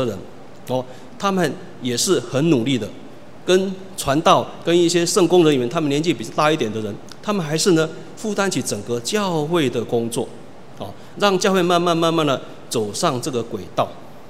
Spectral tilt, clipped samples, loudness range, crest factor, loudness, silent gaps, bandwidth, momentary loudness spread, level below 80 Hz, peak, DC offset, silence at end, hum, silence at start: -4.5 dB/octave; under 0.1%; 4 LU; 20 dB; -20 LUFS; none; 16 kHz; 13 LU; -56 dBFS; 0 dBFS; 1%; 0 s; none; 0 s